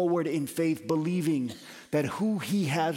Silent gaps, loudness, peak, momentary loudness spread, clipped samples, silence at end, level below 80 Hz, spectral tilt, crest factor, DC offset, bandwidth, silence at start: none; -29 LUFS; -14 dBFS; 4 LU; under 0.1%; 0 s; -70 dBFS; -6 dB/octave; 14 dB; under 0.1%; 17 kHz; 0 s